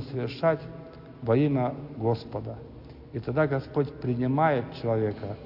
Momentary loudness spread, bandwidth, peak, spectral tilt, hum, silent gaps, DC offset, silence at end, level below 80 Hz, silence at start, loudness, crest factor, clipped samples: 18 LU; 5.8 kHz; -12 dBFS; -10 dB/octave; none; none; under 0.1%; 0 s; -54 dBFS; 0 s; -28 LUFS; 16 dB; under 0.1%